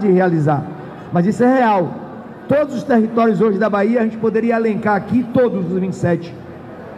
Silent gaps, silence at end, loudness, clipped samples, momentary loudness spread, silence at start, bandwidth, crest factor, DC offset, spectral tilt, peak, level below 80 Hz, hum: none; 0 s; -16 LUFS; under 0.1%; 17 LU; 0 s; 10 kHz; 12 dB; under 0.1%; -8.5 dB/octave; -4 dBFS; -54 dBFS; none